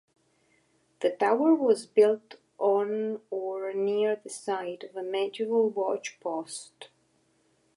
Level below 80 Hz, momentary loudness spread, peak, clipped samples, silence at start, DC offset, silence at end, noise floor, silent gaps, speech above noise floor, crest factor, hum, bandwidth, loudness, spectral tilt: -86 dBFS; 12 LU; -10 dBFS; under 0.1%; 1 s; under 0.1%; 0.9 s; -69 dBFS; none; 42 dB; 18 dB; none; 11.5 kHz; -28 LUFS; -4.5 dB/octave